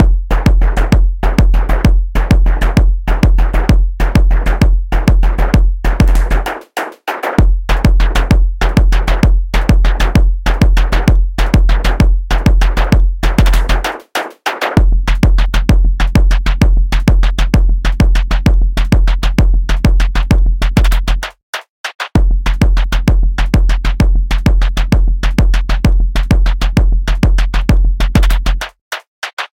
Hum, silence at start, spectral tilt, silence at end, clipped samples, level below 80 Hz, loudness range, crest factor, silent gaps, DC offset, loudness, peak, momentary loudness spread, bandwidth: none; 0 s; -6.5 dB/octave; 0.05 s; under 0.1%; -10 dBFS; 2 LU; 10 dB; 21.43-21.53 s, 21.69-21.84 s, 21.95-21.99 s, 28.81-28.91 s, 29.08-29.22 s, 29.33-29.37 s; under 0.1%; -14 LUFS; 0 dBFS; 5 LU; 10.5 kHz